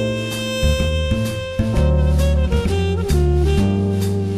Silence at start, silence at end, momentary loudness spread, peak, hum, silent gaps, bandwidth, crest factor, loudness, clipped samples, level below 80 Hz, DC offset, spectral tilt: 0 s; 0 s; 5 LU; -4 dBFS; none; none; 14 kHz; 12 dB; -19 LUFS; under 0.1%; -20 dBFS; under 0.1%; -6.5 dB/octave